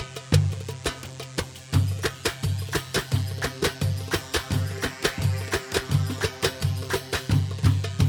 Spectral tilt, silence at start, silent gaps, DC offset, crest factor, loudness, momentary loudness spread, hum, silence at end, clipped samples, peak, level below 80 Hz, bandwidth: -5 dB/octave; 0 s; none; under 0.1%; 20 dB; -26 LUFS; 7 LU; none; 0 s; under 0.1%; -4 dBFS; -42 dBFS; 19.5 kHz